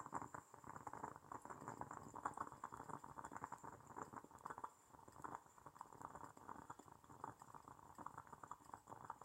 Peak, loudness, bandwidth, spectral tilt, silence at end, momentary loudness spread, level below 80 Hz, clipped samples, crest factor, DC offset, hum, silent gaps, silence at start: -30 dBFS; -56 LUFS; 16 kHz; -5 dB/octave; 0 s; 9 LU; -80 dBFS; under 0.1%; 26 dB; under 0.1%; none; none; 0 s